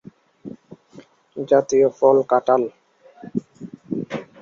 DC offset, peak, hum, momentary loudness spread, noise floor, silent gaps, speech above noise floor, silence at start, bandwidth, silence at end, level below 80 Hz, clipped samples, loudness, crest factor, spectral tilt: under 0.1%; -4 dBFS; none; 24 LU; -48 dBFS; none; 31 dB; 0.45 s; 7.2 kHz; 0.2 s; -66 dBFS; under 0.1%; -20 LUFS; 18 dB; -6.5 dB/octave